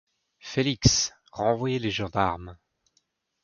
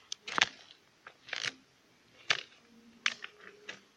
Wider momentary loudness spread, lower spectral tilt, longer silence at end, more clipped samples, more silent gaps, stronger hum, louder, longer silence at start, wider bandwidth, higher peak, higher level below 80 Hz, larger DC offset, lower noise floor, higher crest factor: second, 15 LU vs 24 LU; first, -4 dB/octave vs 0 dB/octave; first, 0.9 s vs 0.2 s; neither; neither; neither; first, -26 LUFS vs -34 LUFS; first, 0.45 s vs 0.25 s; second, 7.2 kHz vs 16 kHz; first, -2 dBFS vs -6 dBFS; first, -44 dBFS vs -82 dBFS; neither; first, -72 dBFS vs -66 dBFS; second, 26 dB vs 34 dB